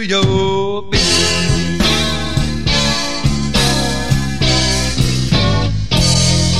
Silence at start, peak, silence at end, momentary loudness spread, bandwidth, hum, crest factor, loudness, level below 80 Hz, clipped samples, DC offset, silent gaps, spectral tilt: 0 s; 0 dBFS; 0 s; 5 LU; 14.5 kHz; none; 14 dB; -14 LUFS; -24 dBFS; under 0.1%; 5%; none; -4 dB/octave